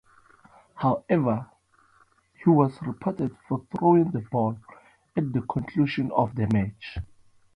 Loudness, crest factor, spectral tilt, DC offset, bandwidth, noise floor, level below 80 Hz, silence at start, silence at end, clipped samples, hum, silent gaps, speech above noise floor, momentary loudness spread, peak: -26 LUFS; 20 dB; -9.5 dB/octave; under 0.1%; 9.8 kHz; -62 dBFS; -52 dBFS; 0.75 s; 0.5 s; under 0.1%; none; none; 37 dB; 12 LU; -6 dBFS